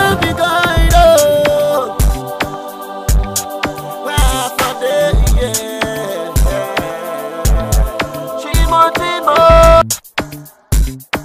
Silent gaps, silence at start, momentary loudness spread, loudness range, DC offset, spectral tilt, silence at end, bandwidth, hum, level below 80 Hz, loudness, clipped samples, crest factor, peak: none; 0 s; 14 LU; 5 LU; under 0.1%; -4 dB/octave; 0 s; 15.5 kHz; none; -18 dBFS; -13 LUFS; under 0.1%; 12 dB; 0 dBFS